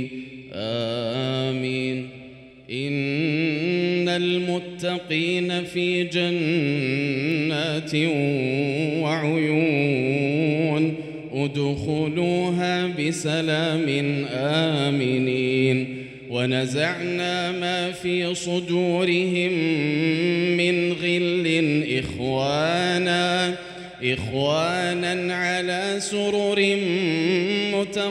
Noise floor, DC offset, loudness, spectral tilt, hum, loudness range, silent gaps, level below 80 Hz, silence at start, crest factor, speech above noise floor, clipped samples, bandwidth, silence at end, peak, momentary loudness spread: -44 dBFS; under 0.1%; -23 LUFS; -5.5 dB/octave; none; 3 LU; none; -58 dBFS; 0 s; 16 dB; 21 dB; under 0.1%; 11.5 kHz; 0 s; -6 dBFS; 6 LU